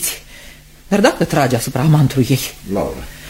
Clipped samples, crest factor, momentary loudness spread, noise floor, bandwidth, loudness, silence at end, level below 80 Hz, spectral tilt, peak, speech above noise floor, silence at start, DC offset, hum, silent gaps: under 0.1%; 16 dB; 9 LU; -39 dBFS; 16.5 kHz; -16 LUFS; 0 s; -38 dBFS; -5.5 dB/octave; 0 dBFS; 24 dB; 0 s; under 0.1%; none; none